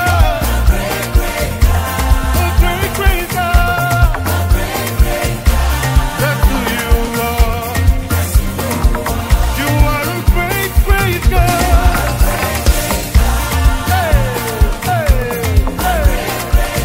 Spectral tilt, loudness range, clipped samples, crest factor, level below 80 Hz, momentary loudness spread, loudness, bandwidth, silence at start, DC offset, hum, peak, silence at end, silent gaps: -5 dB/octave; 1 LU; under 0.1%; 12 dB; -14 dBFS; 3 LU; -14 LUFS; 16.5 kHz; 0 s; under 0.1%; none; 0 dBFS; 0 s; none